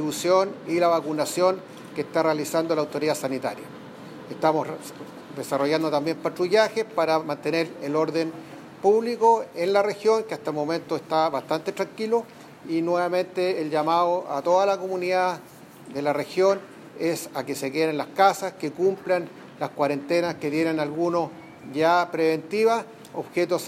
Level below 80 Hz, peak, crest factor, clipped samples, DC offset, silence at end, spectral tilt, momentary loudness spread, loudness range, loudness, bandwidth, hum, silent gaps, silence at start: -76 dBFS; -6 dBFS; 20 dB; under 0.1%; under 0.1%; 0 s; -5 dB/octave; 13 LU; 3 LU; -24 LUFS; 16 kHz; none; none; 0 s